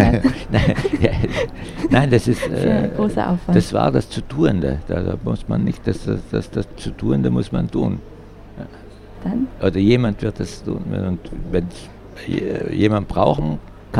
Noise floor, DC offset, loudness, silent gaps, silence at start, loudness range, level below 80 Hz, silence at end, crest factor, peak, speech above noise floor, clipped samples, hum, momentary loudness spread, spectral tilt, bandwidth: -39 dBFS; under 0.1%; -20 LUFS; none; 0 s; 5 LU; -32 dBFS; 0 s; 20 dB; 0 dBFS; 20 dB; under 0.1%; none; 12 LU; -7.5 dB/octave; 13 kHz